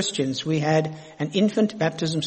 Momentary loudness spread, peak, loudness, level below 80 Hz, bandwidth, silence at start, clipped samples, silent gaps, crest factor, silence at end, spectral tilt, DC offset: 7 LU; -8 dBFS; -24 LUFS; -64 dBFS; 8.8 kHz; 0 s; under 0.1%; none; 16 dB; 0 s; -5 dB/octave; under 0.1%